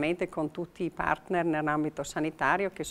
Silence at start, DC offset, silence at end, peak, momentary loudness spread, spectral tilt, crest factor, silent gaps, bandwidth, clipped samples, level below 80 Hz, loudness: 0 s; under 0.1%; 0 s; -10 dBFS; 7 LU; -5.5 dB/octave; 20 dB; none; 13.5 kHz; under 0.1%; -56 dBFS; -30 LUFS